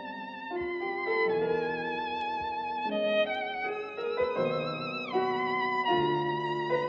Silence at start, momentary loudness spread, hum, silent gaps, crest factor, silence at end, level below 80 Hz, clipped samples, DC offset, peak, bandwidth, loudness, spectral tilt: 0 s; 7 LU; none; none; 16 dB; 0 s; -66 dBFS; under 0.1%; under 0.1%; -14 dBFS; 7.2 kHz; -31 LUFS; -3 dB/octave